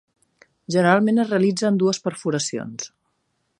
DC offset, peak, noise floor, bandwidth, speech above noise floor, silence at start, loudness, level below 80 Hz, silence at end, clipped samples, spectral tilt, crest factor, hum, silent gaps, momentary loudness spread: under 0.1%; -2 dBFS; -72 dBFS; 11.5 kHz; 52 dB; 0.7 s; -20 LUFS; -70 dBFS; 0.75 s; under 0.1%; -5 dB/octave; 20 dB; none; none; 14 LU